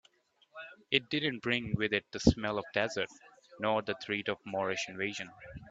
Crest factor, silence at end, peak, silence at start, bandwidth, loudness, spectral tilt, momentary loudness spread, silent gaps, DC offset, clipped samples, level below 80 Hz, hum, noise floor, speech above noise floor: 26 dB; 0 s; -8 dBFS; 0.55 s; 8 kHz; -33 LUFS; -5 dB/octave; 16 LU; none; under 0.1%; under 0.1%; -52 dBFS; none; -68 dBFS; 35 dB